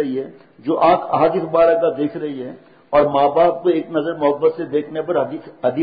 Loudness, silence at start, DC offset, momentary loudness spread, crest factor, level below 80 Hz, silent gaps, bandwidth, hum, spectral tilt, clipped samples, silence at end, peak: -18 LUFS; 0 s; under 0.1%; 12 LU; 14 dB; -56 dBFS; none; 5 kHz; none; -11.5 dB/octave; under 0.1%; 0 s; -4 dBFS